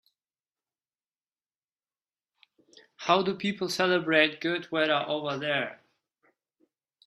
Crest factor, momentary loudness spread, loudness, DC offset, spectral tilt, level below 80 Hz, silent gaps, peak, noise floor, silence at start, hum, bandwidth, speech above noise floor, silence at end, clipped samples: 24 dB; 8 LU; -27 LUFS; under 0.1%; -4.5 dB/octave; -76 dBFS; none; -8 dBFS; under -90 dBFS; 3 s; none; 13.5 kHz; over 63 dB; 1.3 s; under 0.1%